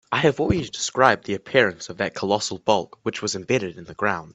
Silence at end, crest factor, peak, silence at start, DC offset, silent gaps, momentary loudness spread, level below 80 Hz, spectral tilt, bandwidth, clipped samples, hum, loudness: 0 s; 22 dB; 0 dBFS; 0.1 s; under 0.1%; none; 9 LU; -48 dBFS; -4 dB/octave; 8.4 kHz; under 0.1%; none; -22 LUFS